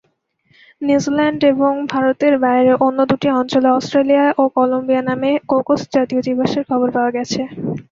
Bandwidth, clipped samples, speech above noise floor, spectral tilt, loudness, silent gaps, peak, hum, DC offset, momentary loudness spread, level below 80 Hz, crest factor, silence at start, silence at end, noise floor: 7.6 kHz; under 0.1%; 45 dB; -6 dB/octave; -16 LUFS; none; -2 dBFS; none; under 0.1%; 5 LU; -56 dBFS; 14 dB; 0.8 s; 0.1 s; -60 dBFS